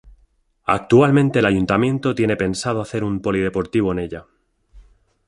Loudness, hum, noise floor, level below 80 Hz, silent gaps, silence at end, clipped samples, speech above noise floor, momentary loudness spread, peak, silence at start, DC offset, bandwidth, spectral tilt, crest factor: -19 LUFS; none; -59 dBFS; -44 dBFS; none; 0.5 s; under 0.1%; 41 dB; 10 LU; -2 dBFS; 0.05 s; under 0.1%; 11.5 kHz; -6.5 dB/octave; 18 dB